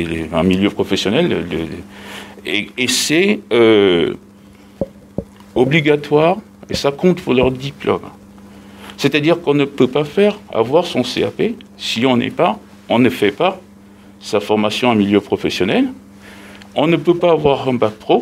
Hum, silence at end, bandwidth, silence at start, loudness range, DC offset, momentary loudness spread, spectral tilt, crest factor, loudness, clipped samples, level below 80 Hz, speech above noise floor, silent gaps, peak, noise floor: none; 0 s; 16 kHz; 0 s; 2 LU; under 0.1%; 14 LU; -5 dB/octave; 16 dB; -16 LUFS; under 0.1%; -46 dBFS; 27 dB; none; 0 dBFS; -42 dBFS